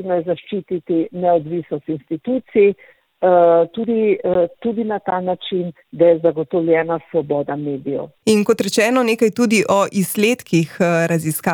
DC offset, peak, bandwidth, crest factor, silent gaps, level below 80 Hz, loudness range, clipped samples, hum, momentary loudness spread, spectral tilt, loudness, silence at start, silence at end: under 0.1%; -2 dBFS; 19.5 kHz; 14 dB; none; -60 dBFS; 2 LU; under 0.1%; none; 10 LU; -5.5 dB/octave; -18 LUFS; 0 s; 0 s